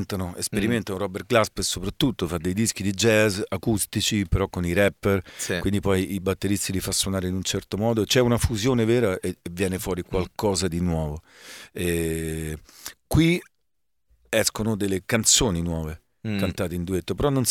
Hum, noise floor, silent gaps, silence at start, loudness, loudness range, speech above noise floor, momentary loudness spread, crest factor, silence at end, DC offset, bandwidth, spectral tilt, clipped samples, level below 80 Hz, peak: none; -81 dBFS; none; 0 s; -24 LUFS; 4 LU; 57 dB; 10 LU; 20 dB; 0 s; under 0.1%; 18 kHz; -4.5 dB/octave; under 0.1%; -40 dBFS; -4 dBFS